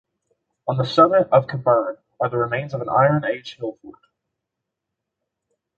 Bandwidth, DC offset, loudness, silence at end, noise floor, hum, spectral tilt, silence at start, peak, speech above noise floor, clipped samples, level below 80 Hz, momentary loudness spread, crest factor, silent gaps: 7.6 kHz; under 0.1%; -19 LUFS; 1.9 s; -82 dBFS; none; -7.5 dB/octave; 0.65 s; -2 dBFS; 63 dB; under 0.1%; -60 dBFS; 16 LU; 20 dB; none